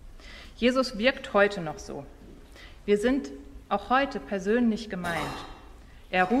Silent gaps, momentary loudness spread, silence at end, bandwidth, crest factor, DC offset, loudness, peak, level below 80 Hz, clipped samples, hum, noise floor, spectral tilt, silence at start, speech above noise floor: none; 20 LU; 0 s; 14.5 kHz; 22 dB; under 0.1%; -27 LUFS; -6 dBFS; -48 dBFS; under 0.1%; none; -48 dBFS; -5 dB/octave; 0.05 s; 22 dB